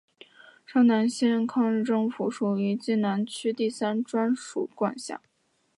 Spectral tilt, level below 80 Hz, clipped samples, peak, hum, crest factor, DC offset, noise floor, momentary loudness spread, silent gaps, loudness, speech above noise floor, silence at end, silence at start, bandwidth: -6 dB/octave; -80 dBFS; under 0.1%; -12 dBFS; none; 16 dB; under 0.1%; -53 dBFS; 8 LU; none; -26 LUFS; 27 dB; 0.6 s; 0.7 s; 11.5 kHz